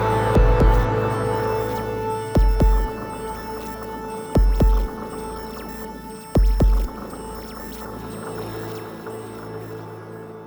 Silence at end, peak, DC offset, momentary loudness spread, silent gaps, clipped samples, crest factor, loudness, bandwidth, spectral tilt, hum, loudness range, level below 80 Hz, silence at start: 0 s; -4 dBFS; under 0.1%; 16 LU; none; under 0.1%; 16 dB; -24 LUFS; over 20 kHz; -7 dB/octave; none; 8 LU; -24 dBFS; 0 s